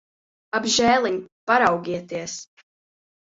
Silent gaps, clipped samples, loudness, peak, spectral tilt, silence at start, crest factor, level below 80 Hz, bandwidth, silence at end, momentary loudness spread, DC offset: 1.32-1.47 s; under 0.1%; -21 LUFS; -4 dBFS; -2.5 dB/octave; 0.55 s; 20 dB; -60 dBFS; 8 kHz; 0.85 s; 13 LU; under 0.1%